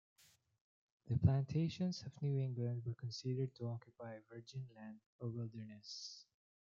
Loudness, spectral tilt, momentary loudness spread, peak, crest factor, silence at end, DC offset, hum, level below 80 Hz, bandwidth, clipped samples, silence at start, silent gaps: -42 LUFS; -7 dB/octave; 17 LU; -20 dBFS; 24 dB; 0.4 s; under 0.1%; none; -66 dBFS; 7.4 kHz; under 0.1%; 1.05 s; 5.06-5.19 s